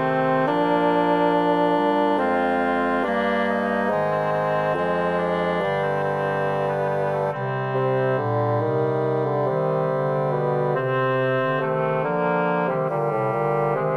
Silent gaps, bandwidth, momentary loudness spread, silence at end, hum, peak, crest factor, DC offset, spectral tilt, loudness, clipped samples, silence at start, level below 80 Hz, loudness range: none; 12 kHz; 4 LU; 0 s; none; -8 dBFS; 12 dB; 0.1%; -8 dB/octave; -22 LUFS; under 0.1%; 0 s; -64 dBFS; 3 LU